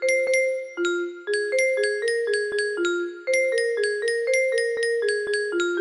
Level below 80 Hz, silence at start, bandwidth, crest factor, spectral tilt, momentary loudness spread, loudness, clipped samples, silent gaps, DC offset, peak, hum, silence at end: -72 dBFS; 0 s; 11.5 kHz; 14 dB; -1 dB/octave; 5 LU; -23 LUFS; under 0.1%; none; under 0.1%; -10 dBFS; none; 0 s